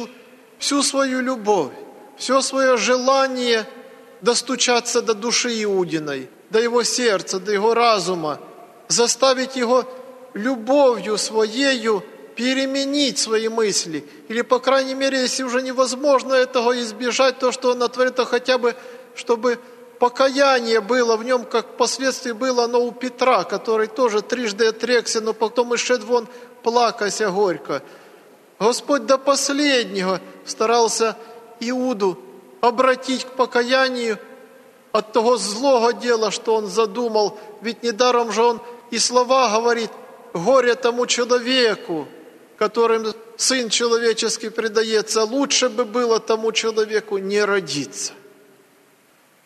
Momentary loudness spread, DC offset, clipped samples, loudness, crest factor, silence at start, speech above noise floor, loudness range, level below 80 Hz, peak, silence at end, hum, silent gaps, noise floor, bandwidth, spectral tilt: 9 LU; under 0.1%; under 0.1%; -19 LUFS; 18 dB; 0 s; 36 dB; 2 LU; -76 dBFS; -2 dBFS; 1.3 s; none; none; -56 dBFS; 13.5 kHz; -2 dB/octave